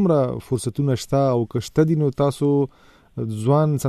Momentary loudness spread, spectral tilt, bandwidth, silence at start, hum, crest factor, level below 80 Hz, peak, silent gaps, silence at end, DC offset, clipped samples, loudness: 9 LU; -7.5 dB/octave; 14 kHz; 0 s; none; 16 dB; -50 dBFS; -4 dBFS; none; 0 s; under 0.1%; under 0.1%; -21 LUFS